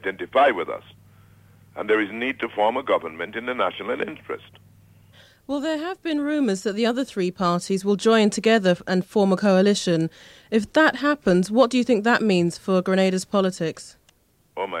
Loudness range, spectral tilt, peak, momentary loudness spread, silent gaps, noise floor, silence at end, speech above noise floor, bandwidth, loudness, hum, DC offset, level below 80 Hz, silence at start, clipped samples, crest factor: 7 LU; -5.5 dB/octave; -4 dBFS; 12 LU; none; -61 dBFS; 0 s; 39 dB; 13.5 kHz; -22 LUFS; none; under 0.1%; -62 dBFS; 0.05 s; under 0.1%; 18 dB